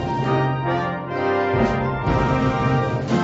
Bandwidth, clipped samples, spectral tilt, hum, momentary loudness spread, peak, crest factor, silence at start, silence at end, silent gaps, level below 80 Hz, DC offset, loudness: 7.8 kHz; under 0.1%; -7.5 dB/octave; none; 4 LU; -4 dBFS; 16 dB; 0 s; 0 s; none; -36 dBFS; under 0.1%; -21 LUFS